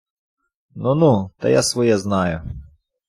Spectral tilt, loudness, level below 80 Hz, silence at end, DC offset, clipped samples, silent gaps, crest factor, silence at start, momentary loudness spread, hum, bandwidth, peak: -5.5 dB/octave; -18 LUFS; -46 dBFS; 0.45 s; under 0.1%; under 0.1%; none; 16 dB; 0.75 s; 14 LU; none; 14 kHz; -4 dBFS